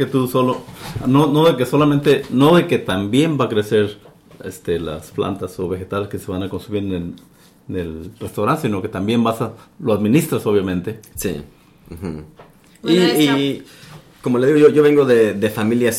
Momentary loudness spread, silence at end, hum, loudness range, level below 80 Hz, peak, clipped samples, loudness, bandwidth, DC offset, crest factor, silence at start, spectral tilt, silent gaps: 16 LU; 0 s; none; 9 LU; -48 dBFS; -2 dBFS; under 0.1%; -17 LUFS; 16.5 kHz; under 0.1%; 16 dB; 0 s; -6 dB/octave; none